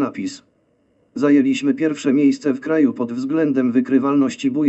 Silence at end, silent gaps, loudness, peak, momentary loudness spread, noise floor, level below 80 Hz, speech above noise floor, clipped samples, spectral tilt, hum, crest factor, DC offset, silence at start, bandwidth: 0 s; none; -18 LUFS; -4 dBFS; 8 LU; -61 dBFS; -68 dBFS; 44 dB; under 0.1%; -6 dB/octave; none; 14 dB; under 0.1%; 0 s; 8.2 kHz